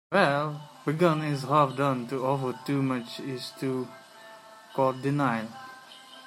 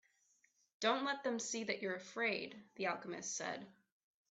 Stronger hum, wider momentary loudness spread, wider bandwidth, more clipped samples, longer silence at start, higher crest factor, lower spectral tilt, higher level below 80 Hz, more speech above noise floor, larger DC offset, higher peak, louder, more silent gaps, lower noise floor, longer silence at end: neither; first, 21 LU vs 8 LU; first, 15.5 kHz vs 8.2 kHz; neither; second, 0.1 s vs 0.8 s; about the same, 22 dB vs 22 dB; first, -6.5 dB/octave vs -2 dB/octave; first, -74 dBFS vs -88 dBFS; second, 22 dB vs 36 dB; neither; first, -6 dBFS vs -20 dBFS; first, -28 LUFS vs -40 LUFS; neither; second, -49 dBFS vs -76 dBFS; second, 0 s vs 0.6 s